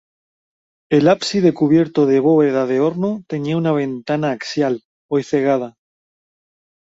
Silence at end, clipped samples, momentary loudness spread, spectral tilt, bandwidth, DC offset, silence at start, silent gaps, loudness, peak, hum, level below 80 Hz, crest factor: 1.25 s; under 0.1%; 8 LU; -6.5 dB/octave; 8 kHz; under 0.1%; 0.9 s; 4.85-5.09 s; -17 LUFS; -2 dBFS; none; -60 dBFS; 16 dB